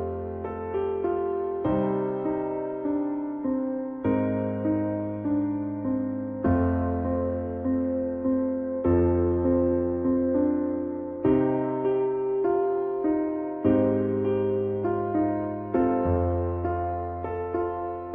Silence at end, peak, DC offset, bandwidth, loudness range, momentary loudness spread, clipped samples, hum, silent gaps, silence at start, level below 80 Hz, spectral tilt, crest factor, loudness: 0 s; -10 dBFS; under 0.1%; 3.4 kHz; 3 LU; 7 LU; under 0.1%; none; none; 0 s; -46 dBFS; -12.5 dB/octave; 16 dB; -27 LUFS